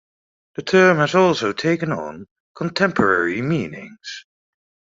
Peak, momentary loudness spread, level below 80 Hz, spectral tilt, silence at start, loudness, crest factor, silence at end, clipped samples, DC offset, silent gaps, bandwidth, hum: -2 dBFS; 20 LU; -60 dBFS; -5.5 dB/octave; 0.6 s; -18 LUFS; 18 dB; 0.75 s; under 0.1%; under 0.1%; 2.31-2.55 s; 7.6 kHz; none